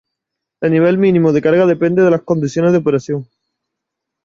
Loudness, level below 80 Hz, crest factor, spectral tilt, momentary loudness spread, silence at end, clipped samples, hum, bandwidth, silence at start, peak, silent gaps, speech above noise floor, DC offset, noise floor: -14 LUFS; -54 dBFS; 12 dB; -8 dB/octave; 7 LU; 1 s; under 0.1%; none; 7.6 kHz; 0.6 s; -2 dBFS; none; 67 dB; under 0.1%; -79 dBFS